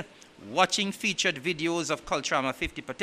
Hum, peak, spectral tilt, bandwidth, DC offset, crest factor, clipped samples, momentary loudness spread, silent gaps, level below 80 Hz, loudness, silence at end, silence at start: none; -6 dBFS; -3 dB/octave; 15.5 kHz; under 0.1%; 24 dB; under 0.1%; 8 LU; none; -54 dBFS; -28 LUFS; 0 s; 0 s